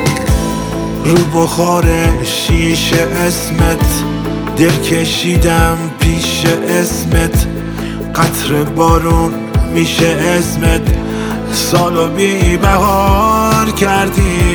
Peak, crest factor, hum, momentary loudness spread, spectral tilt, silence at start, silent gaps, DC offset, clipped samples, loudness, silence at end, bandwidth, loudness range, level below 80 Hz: 0 dBFS; 12 dB; none; 6 LU; -5 dB/octave; 0 s; none; under 0.1%; under 0.1%; -12 LUFS; 0 s; over 20 kHz; 2 LU; -20 dBFS